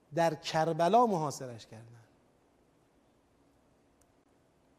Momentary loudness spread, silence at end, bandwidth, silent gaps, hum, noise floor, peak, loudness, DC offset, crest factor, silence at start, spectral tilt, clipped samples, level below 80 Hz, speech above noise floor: 24 LU; 2.95 s; 15 kHz; none; none; -68 dBFS; -14 dBFS; -30 LUFS; under 0.1%; 20 dB; 0.1 s; -5.5 dB/octave; under 0.1%; -74 dBFS; 38 dB